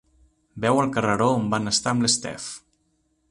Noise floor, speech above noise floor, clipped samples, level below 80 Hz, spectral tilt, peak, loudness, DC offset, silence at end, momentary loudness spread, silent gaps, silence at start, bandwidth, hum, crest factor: -69 dBFS; 46 dB; under 0.1%; -56 dBFS; -4 dB/octave; -6 dBFS; -22 LUFS; under 0.1%; 0.7 s; 13 LU; none; 0.55 s; 11.5 kHz; none; 18 dB